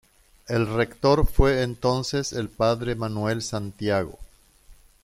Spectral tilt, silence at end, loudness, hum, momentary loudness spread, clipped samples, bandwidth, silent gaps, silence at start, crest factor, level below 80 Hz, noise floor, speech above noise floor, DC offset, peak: -5.5 dB/octave; 0.3 s; -25 LUFS; none; 8 LU; under 0.1%; 15.5 kHz; none; 0.5 s; 20 dB; -34 dBFS; -52 dBFS; 29 dB; under 0.1%; -4 dBFS